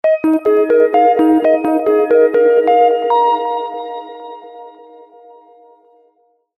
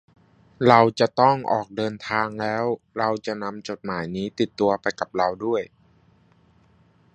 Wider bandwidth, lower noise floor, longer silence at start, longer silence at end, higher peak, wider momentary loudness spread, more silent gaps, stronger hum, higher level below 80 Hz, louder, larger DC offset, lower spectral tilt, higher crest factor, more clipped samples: first, 12 kHz vs 9.4 kHz; about the same, -58 dBFS vs -58 dBFS; second, 0.05 s vs 0.6 s; first, 1.9 s vs 1.45 s; about the same, 0 dBFS vs 0 dBFS; first, 17 LU vs 13 LU; neither; neither; about the same, -62 dBFS vs -60 dBFS; first, -13 LUFS vs -23 LUFS; neither; about the same, -6 dB/octave vs -6 dB/octave; second, 14 dB vs 24 dB; neither